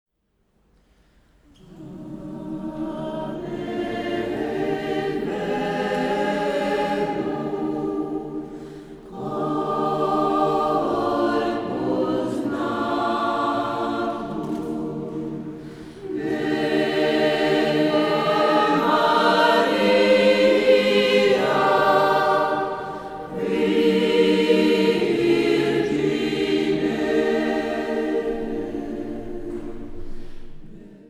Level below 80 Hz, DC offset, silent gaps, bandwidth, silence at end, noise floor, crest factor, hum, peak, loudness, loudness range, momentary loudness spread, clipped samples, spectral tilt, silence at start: -46 dBFS; under 0.1%; none; 13.5 kHz; 0.15 s; -68 dBFS; 16 dB; none; -4 dBFS; -21 LUFS; 10 LU; 15 LU; under 0.1%; -5.5 dB/octave; 1.7 s